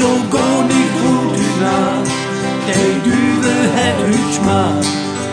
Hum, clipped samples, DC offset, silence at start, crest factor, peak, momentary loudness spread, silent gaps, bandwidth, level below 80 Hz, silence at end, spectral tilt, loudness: none; under 0.1%; under 0.1%; 0 s; 12 dB; -2 dBFS; 4 LU; none; 10 kHz; -46 dBFS; 0 s; -4.5 dB/octave; -14 LUFS